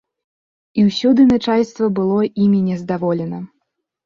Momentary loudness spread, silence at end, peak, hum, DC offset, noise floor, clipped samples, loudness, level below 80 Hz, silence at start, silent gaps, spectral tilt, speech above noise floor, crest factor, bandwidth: 13 LU; 0.6 s; -4 dBFS; none; under 0.1%; -72 dBFS; under 0.1%; -16 LUFS; -54 dBFS; 0.75 s; none; -7.5 dB/octave; 57 dB; 14 dB; 7.2 kHz